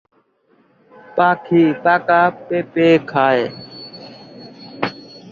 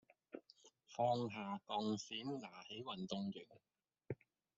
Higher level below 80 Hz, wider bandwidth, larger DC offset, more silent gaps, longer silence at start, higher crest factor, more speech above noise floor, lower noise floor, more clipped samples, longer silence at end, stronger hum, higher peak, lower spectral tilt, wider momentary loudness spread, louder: first, -62 dBFS vs -84 dBFS; second, 7 kHz vs 7.8 kHz; neither; neither; first, 1.15 s vs 0.35 s; second, 16 dB vs 22 dB; first, 43 dB vs 26 dB; second, -58 dBFS vs -70 dBFS; neither; second, 0.15 s vs 0.45 s; neither; first, -2 dBFS vs -24 dBFS; first, -7.5 dB/octave vs -4.5 dB/octave; first, 23 LU vs 19 LU; first, -16 LUFS vs -45 LUFS